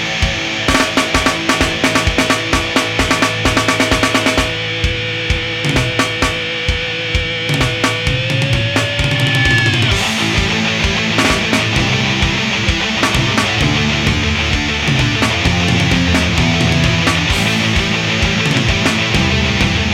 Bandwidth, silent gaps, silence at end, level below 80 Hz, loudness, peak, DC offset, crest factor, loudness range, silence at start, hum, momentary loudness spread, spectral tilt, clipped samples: 17.5 kHz; none; 0 s; -26 dBFS; -14 LUFS; 0 dBFS; under 0.1%; 14 dB; 2 LU; 0 s; none; 3 LU; -4 dB/octave; under 0.1%